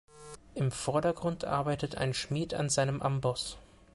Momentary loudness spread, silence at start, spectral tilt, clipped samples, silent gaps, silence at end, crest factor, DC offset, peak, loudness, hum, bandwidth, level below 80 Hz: 13 LU; 0.15 s; -5 dB/octave; under 0.1%; none; 0.3 s; 16 dB; under 0.1%; -16 dBFS; -32 LUFS; none; 11.5 kHz; -56 dBFS